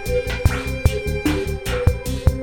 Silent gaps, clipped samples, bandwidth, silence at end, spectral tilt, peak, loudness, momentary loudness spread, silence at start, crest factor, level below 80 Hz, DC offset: none; under 0.1%; 18.5 kHz; 0 s; -6 dB/octave; -2 dBFS; -22 LUFS; 2 LU; 0 s; 18 dB; -24 dBFS; under 0.1%